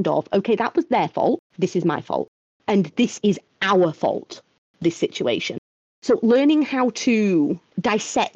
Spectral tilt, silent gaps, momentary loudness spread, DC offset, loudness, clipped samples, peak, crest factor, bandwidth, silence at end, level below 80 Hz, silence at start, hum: -5.5 dB/octave; 1.39-1.50 s, 2.28-2.60 s, 4.58-4.74 s, 5.58-6.02 s; 10 LU; under 0.1%; -21 LUFS; under 0.1%; -8 dBFS; 12 dB; 8.4 kHz; 0.05 s; -64 dBFS; 0 s; none